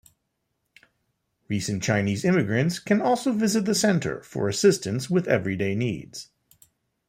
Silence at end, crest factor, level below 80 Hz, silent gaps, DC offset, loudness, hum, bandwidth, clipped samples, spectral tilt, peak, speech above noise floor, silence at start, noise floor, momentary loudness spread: 0.85 s; 20 dB; -62 dBFS; none; under 0.1%; -24 LUFS; none; 16 kHz; under 0.1%; -5 dB/octave; -6 dBFS; 54 dB; 1.5 s; -77 dBFS; 9 LU